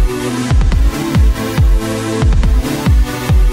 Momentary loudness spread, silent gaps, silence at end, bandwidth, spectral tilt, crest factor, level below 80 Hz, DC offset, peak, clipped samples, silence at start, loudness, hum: 3 LU; none; 0 s; 16 kHz; -6 dB/octave; 8 dB; -12 dBFS; under 0.1%; -2 dBFS; under 0.1%; 0 s; -14 LUFS; none